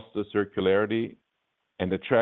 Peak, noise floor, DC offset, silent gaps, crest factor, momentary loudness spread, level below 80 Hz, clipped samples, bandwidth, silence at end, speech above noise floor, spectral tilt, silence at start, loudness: -8 dBFS; -79 dBFS; under 0.1%; none; 20 dB; 8 LU; -66 dBFS; under 0.1%; 4.1 kHz; 0 s; 53 dB; -9.5 dB/octave; 0 s; -27 LUFS